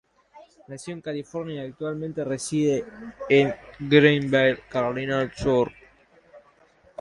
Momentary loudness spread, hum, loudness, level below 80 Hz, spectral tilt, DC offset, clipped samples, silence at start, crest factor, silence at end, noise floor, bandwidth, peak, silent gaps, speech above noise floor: 18 LU; none; -24 LUFS; -54 dBFS; -5.5 dB/octave; under 0.1%; under 0.1%; 0.35 s; 22 dB; 0.6 s; -58 dBFS; 11.5 kHz; -2 dBFS; none; 34 dB